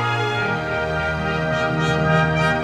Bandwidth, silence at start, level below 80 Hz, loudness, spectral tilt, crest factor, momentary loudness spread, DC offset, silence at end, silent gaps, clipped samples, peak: 10.5 kHz; 0 s; -38 dBFS; -20 LUFS; -6 dB/octave; 14 dB; 5 LU; under 0.1%; 0 s; none; under 0.1%; -6 dBFS